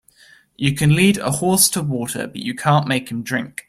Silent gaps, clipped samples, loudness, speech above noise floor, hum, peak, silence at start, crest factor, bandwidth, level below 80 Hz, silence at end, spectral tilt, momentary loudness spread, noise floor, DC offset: none; under 0.1%; -18 LUFS; 32 dB; none; -2 dBFS; 0.6 s; 18 dB; 16 kHz; -50 dBFS; 0.2 s; -4 dB/octave; 10 LU; -51 dBFS; under 0.1%